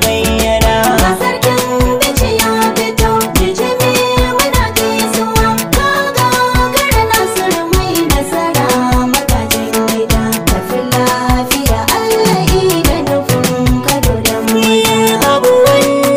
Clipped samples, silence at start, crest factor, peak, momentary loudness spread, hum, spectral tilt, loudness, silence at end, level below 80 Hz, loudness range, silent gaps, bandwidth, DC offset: under 0.1%; 0 s; 12 dB; 0 dBFS; 3 LU; none; -4 dB/octave; -11 LUFS; 0 s; -22 dBFS; 1 LU; none; 16.5 kHz; under 0.1%